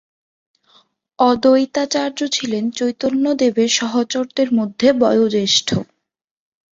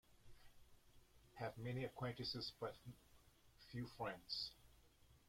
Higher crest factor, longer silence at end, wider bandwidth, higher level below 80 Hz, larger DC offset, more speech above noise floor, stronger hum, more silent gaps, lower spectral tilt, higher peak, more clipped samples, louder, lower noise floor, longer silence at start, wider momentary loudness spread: about the same, 16 dB vs 20 dB; first, 0.95 s vs 0 s; second, 8 kHz vs 16.5 kHz; first, -58 dBFS vs -72 dBFS; neither; first, 59 dB vs 22 dB; neither; neither; second, -3.5 dB/octave vs -5.5 dB/octave; first, -2 dBFS vs -32 dBFS; neither; first, -17 LUFS vs -49 LUFS; first, -76 dBFS vs -71 dBFS; first, 1.2 s vs 0.1 s; second, 6 LU vs 19 LU